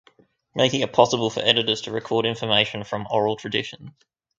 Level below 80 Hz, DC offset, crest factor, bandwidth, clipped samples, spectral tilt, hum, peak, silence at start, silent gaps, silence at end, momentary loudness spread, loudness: -60 dBFS; under 0.1%; 24 dB; 7.8 kHz; under 0.1%; -4 dB/octave; none; 0 dBFS; 0.55 s; none; 0.5 s; 8 LU; -22 LUFS